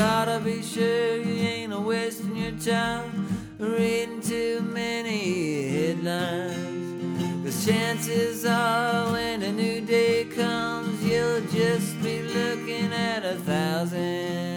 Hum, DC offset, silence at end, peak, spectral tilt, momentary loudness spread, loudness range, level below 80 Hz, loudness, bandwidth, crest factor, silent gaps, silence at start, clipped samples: none; under 0.1%; 0 s; -10 dBFS; -5 dB/octave; 6 LU; 3 LU; -58 dBFS; -26 LUFS; 19.5 kHz; 16 dB; none; 0 s; under 0.1%